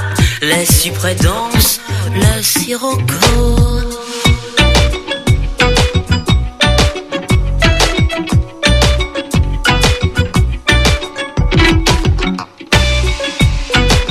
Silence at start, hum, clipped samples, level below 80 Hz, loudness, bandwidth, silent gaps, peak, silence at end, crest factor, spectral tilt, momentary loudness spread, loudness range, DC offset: 0 s; none; under 0.1%; -18 dBFS; -13 LUFS; 16 kHz; none; 0 dBFS; 0 s; 12 dB; -4 dB/octave; 6 LU; 1 LU; under 0.1%